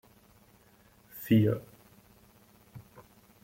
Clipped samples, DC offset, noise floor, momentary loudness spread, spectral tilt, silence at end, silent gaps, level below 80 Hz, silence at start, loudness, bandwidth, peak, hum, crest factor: under 0.1%; under 0.1%; -61 dBFS; 27 LU; -8 dB/octave; 0.65 s; none; -66 dBFS; 1.15 s; -28 LUFS; 16.5 kHz; -14 dBFS; none; 22 dB